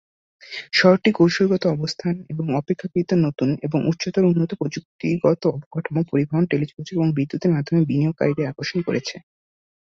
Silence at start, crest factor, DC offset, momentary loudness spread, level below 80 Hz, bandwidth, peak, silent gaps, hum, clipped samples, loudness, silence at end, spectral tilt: 0.45 s; 18 dB; under 0.1%; 9 LU; -60 dBFS; 7.6 kHz; -2 dBFS; 4.85-4.99 s, 5.66-5.71 s; none; under 0.1%; -21 LUFS; 0.75 s; -7 dB/octave